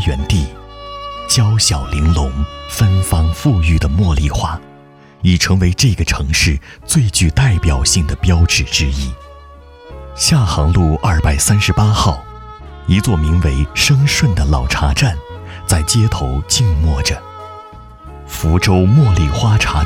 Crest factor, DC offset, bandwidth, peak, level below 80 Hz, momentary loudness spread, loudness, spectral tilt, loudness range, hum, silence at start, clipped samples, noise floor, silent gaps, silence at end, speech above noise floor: 12 dB; under 0.1%; 16.5 kHz; -2 dBFS; -22 dBFS; 15 LU; -14 LUFS; -4.5 dB/octave; 2 LU; none; 0 s; under 0.1%; -41 dBFS; none; 0 s; 28 dB